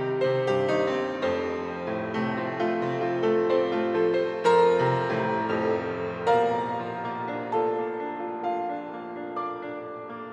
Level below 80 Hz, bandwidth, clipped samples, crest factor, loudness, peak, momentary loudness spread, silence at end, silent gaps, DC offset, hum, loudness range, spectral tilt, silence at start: -70 dBFS; 8.8 kHz; under 0.1%; 16 dB; -27 LUFS; -10 dBFS; 10 LU; 0 s; none; under 0.1%; none; 6 LU; -6.5 dB/octave; 0 s